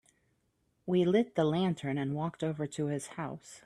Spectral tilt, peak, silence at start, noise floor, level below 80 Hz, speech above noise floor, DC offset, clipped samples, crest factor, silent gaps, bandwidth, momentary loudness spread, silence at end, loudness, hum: -6.5 dB/octave; -16 dBFS; 0.85 s; -76 dBFS; -70 dBFS; 44 dB; under 0.1%; under 0.1%; 18 dB; none; 12.5 kHz; 12 LU; 0.1 s; -32 LUFS; none